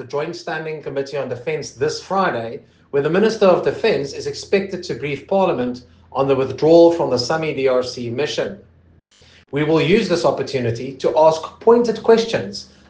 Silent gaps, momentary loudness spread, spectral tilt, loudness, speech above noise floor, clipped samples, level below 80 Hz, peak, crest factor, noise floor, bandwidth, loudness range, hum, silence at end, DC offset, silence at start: none; 12 LU; -5.5 dB/octave; -18 LUFS; 34 dB; under 0.1%; -56 dBFS; 0 dBFS; 18 dB; -52 dBFS; 9.2 kHz; 4 LU; none; 0.25 s; under 0.1%; 0 s